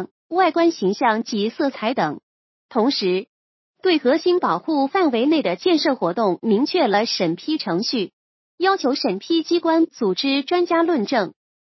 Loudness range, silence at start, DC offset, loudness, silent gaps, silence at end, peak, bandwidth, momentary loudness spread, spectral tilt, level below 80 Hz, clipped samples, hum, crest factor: 3 LU; 0 s; under 0.1%; -20 LUFS; 0.11-0.29 s, 2.23-2.69 s, 3.28-3.74 s, 8.13-8.58 s; 0.45 s; -4 dBFS; 6.2 kHz; 6 LU; -5 dB/octave; -76 dBFS; under 0.1%; none; 16 dB